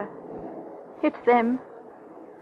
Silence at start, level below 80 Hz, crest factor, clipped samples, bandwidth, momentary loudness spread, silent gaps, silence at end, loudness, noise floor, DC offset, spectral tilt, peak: 0 s; -70 dBFS; 20 dB; under 0.1%; 5.2 kHz; 24 LU; none; 0.05 s; -24 LUFS; -45 dBFS; under 0.1%; -8 dB/octave; -8 dBFS